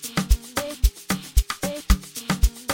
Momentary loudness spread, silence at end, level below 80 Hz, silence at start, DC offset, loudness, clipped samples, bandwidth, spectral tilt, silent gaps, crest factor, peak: 4 LU; 0 s; -24 dBFS; 0 s; under 0.1%; -25 LUFS; under 0.1%; 17 kHz; -4 dB/octave; none; 20 dB; -4 dBFS